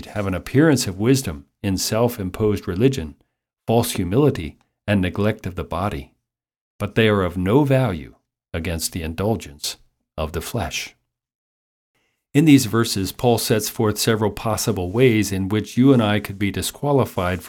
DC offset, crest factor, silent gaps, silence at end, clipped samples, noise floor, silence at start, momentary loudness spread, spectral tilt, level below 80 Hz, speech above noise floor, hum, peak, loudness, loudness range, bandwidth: under 0.1%; 18 dB; 6.61-6.79 s, 11.35-11.94 s; 0 s; under 0.1%; -76 dBFS; 0 s; 12 LU; -5.5 dB/octave; -44 dBFS; 57 dB; none; -2 dBFS; -20 LUFS; 8 LU; 17.5 kHz